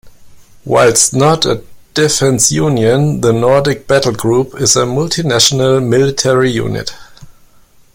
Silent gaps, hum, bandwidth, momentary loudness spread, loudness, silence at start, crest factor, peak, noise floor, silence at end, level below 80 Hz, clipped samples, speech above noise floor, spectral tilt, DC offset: none; none; 17 kHz; 6 LU; -11 LUFS; 0.05 s; 12 dB; 0 dBFS; -44 dBFS; 0.65 s; -42 dBFS; under 0.1%; 33 dB; -4 dB/octave; under 0.1%